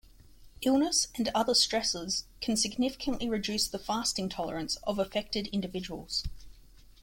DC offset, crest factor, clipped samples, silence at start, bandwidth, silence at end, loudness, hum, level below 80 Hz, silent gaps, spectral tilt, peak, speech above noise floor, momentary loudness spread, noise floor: under 0.1%; 18 dB; under 0.1%; 0.2 s; 17 kHz; 0.4 s; -30 LUFS; none; -52 dBFS; none; -3 dB/octave; -14 dBFS; 24 dB; 9 LU; -54 dBFS